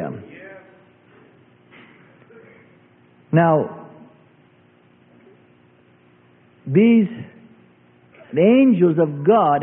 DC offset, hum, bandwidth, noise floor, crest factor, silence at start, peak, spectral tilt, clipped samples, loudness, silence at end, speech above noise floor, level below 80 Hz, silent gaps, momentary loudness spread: under 0.1%; none; 3.5 kHz; -54 dBFS; 18 dB; 0 s; -2 dBFS; -12.5 dB/octave; under 0.1%; -17 LUFS; 0 s; 39 dB; -66 dBFS; none; 26 LU